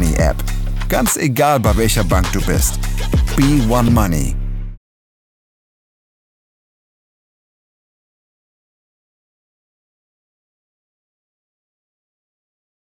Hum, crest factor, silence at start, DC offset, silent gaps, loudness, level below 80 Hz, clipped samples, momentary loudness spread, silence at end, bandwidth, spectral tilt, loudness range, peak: none; 18 dB; 0 s; under 0.1%; none; -16 LUFS; -24 dBFS; under 0.1%; 10 LU; 8.1 s; 19.5 kHz; -5 dB/octave; 10 LU; 0 dBFS